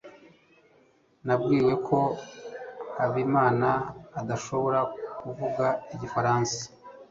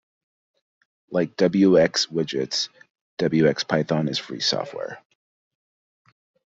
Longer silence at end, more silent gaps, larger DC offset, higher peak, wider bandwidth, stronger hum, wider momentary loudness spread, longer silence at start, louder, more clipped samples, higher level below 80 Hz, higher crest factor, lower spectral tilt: second, 0.05 s vs 1.6 s; second, none vs 2.90-2.95 s, 3.01-3.17 s; neither; second, -8 dBFS vs -4 dBFS; about the same, 7.8 kHz vs 7.8 kHz; neither; about the same, 15 LU vs 15 LU; second, 0.05 s vs 1.1 s; second, -27 LUFS vs -22 LUFS; neither; about the same, -60 dBFS vs -62 dBFS; about the same, 20 dB vs 20 dB; about the same, -6 dB/octave vs -5 dB/octave